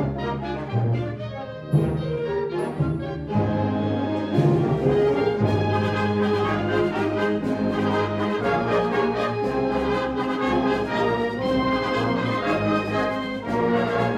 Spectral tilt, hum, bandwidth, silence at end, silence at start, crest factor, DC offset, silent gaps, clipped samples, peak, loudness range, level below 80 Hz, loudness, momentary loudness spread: -7.5 dB/octave; none; 11.5 kHz; 0 s; 0 s; 16 dB; under 0.1%; none; under 0.1%; -8 dBFS; 3 LU; -44 dBFS; -23 LUFS; 5 LU